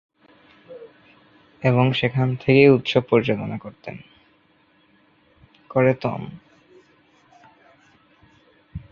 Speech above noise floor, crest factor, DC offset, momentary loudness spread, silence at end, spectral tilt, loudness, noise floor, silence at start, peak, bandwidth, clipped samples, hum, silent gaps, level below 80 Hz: 40 dB; 22 dB; under 0.1%; 26 LU; 0.15 s; -8 dB/octave; -20 LUFS; -60 dBFS; 0.7 s; -2 dBFS; 7 kHz; under 0.1%; none; none; -56 dBFS